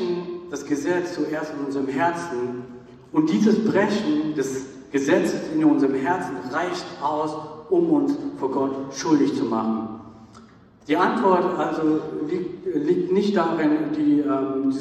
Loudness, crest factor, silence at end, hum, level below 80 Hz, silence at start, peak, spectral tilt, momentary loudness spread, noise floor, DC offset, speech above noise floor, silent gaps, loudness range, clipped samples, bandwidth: -23 LUFS; 18 dB; 0 s; none; -62 dBFS; 0 s; -6 dBFS; -6 dB/octave; 9 LU; -49 dBFS; under 0.1%; 27 dB; none; 3 LU; under 0.1%; 12 kHz